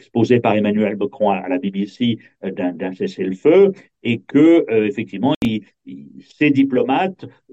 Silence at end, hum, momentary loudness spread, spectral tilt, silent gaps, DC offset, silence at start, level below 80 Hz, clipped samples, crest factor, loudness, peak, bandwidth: 0.25 s; none; 14 LU; -8 dB/octave; 5.36-5.41 s; under 0.1%; 0.15 s; -58 dBFS; under 0.1%; 16 dB; -18 LUFS; -2 dBFS; 8 kHz